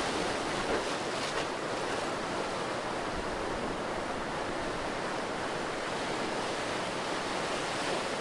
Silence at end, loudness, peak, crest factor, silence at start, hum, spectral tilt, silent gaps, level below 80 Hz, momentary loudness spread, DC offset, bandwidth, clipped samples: 0 s; -33 LUFS; -18 dBFS; 14 dB; 0 s; none; -3.5 dB/octave; none; -52 dBFS; 3 LU; under 0.1%; 11.5 kHz; under 0.1%